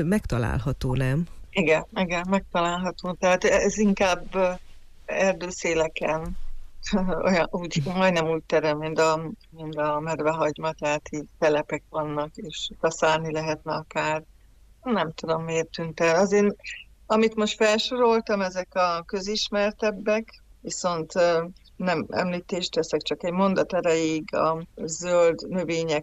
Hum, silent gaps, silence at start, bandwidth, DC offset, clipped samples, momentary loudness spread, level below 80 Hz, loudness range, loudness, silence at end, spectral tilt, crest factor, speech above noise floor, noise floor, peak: none; none; 0 s; 13.5 kHz; under 0.1%; under 0.1%; 10 LU; -44 dBFS; 4 LU; -25 LUFS; 0 s; -5 dB/octave; 14 dB; 29 dB; -53 dBFS; -10 dBFS